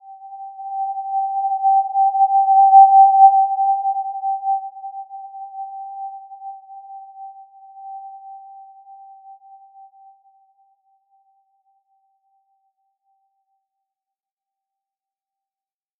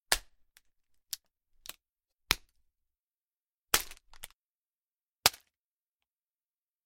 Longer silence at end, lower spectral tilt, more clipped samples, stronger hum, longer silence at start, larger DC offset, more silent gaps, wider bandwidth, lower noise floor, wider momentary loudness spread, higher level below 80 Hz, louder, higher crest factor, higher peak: first, 7.6 s vs 1.55 s; first, -5 dB/octave vs 0.5 dB/octave; neither; neither; about the same, 0.1 s vs 0.1 s; neither; second, none vs 3.03-3.08 s, 3.22-3.29 s, 3.37-3.62 s, 4.35-5.16 s; second, 0.9 kHz vs 16.5 kHz; about the same, under -90 dBFS vs under -90 dBFS; first, 29 LU vs 22 LU; second, under -90 dBFS vs -56 dBFS; first, -15 LUFS vs -32 LUFS; second, 20 dB vs 40 dB; about the same, -2 dBFS vs 0 dBFS